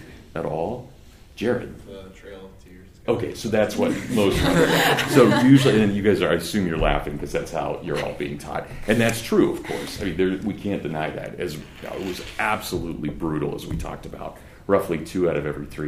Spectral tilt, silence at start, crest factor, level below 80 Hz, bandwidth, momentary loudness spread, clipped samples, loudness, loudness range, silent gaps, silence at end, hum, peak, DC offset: -5.5 dB/octave; 0 s; 20 dB; -40 dBFS; 15.5 kHz; 17 LU; under 0.1%; -22 LUFS; 10 LU; none; 0 s; none; -2 dBFS; under 0.1%